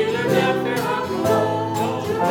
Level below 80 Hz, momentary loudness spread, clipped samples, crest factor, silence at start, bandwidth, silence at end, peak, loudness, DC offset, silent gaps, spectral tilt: -56 dBFS; 4 LU; under 0.1%; 14 dB; 0 s; over 20 kHz; 0 s; -6 dBFS; -21 LUFS; under 0.1%; none; -5.5 dB/octave